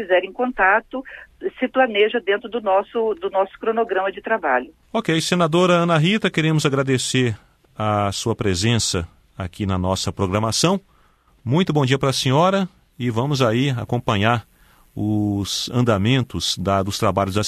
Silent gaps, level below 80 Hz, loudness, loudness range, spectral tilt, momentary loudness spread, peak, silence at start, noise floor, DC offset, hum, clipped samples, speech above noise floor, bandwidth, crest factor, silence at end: none; -48 dBFS; -20 LUFS; 3 LU; -5 dB/octave; 10 LU; -4 dBFS; 0 s; -56 dBFS; under 0.1%; none; under 0.1%; 37 dB; 13.5 kHz; 18 dB; 0 s